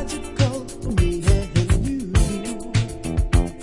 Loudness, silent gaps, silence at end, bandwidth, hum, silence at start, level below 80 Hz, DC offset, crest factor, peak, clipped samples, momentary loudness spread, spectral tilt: -22 LUFS; none; 0 s; 11.5 kHz; none; 0 s; -24 dBFS; under 0.1%; 16 dB; -4 dBFS; under 0.1%; 6 LU; -6 dB/octave